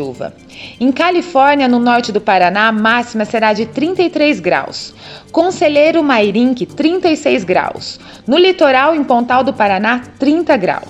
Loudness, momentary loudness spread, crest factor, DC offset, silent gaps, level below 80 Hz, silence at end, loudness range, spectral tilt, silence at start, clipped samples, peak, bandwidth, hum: -12 LUFS; 14 LU; 12 dB; under 0.1%; none; -52 dBFS; 0 s; 2 LU; -5 dB/octave; 0 s; under 0.1%; 0 dBFS; 10 kHz; none